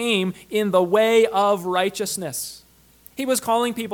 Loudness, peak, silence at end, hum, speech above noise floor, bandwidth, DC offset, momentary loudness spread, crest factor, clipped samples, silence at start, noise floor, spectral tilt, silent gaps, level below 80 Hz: -21 LUFS; -4 dBFS; 0 s; none; 31 dB; 19 kHz; under 0.1%; 12 LU; 16 dB; under 0.1%; 0 s; -51 dBFS; -3.5 dB/octave; none; -62 dBFS